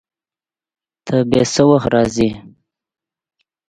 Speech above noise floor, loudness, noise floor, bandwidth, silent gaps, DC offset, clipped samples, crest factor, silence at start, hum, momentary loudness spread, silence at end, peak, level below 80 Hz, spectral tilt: over 76 dB; -15 LUFS; under -90 dBFS; 11 kHz; none; under 0.1%; under 0.1%; 18 dB; 1.05 s; none; 14 LU; 1.2 s; 0 dBFS; -46 dBFS; -5.5 dB/octave